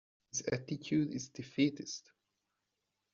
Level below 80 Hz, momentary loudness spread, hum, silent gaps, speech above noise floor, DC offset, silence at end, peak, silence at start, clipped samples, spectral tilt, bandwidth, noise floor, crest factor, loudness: -74 dBFS; 11 LU; none; none; 50 dB; under 0.1%; 1.15 s; -18 dBFS; 0.35 s; under 0.1%; -6 dB/octave; 7.4 kHz; -86 dBFS; 20 dB; -37 LUFS